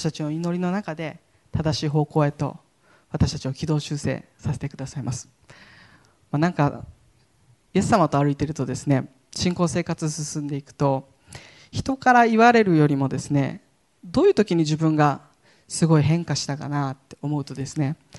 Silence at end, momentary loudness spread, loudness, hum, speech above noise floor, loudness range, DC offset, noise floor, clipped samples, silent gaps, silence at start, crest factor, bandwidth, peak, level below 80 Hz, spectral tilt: 0 s; 13 LU; -23 LUFS; none; 38 dB; 9 LU; under 0.1%; -60 dBFS; under 0.1%; none; 0 s; 20 dB; 11.5 kHz; -4 dBFS; -50 dBFS; -6 dB/octave